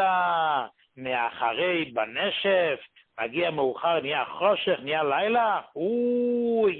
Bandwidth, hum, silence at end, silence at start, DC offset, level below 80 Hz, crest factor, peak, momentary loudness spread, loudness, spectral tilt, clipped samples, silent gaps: 4.4 kHz; none; 0 s; 0 s; under 0.1%; -70 dBFS; 16 dB; -10 dBFS; 7 LU; -26 LUFS; -9 dB/octave; under 0.1%; none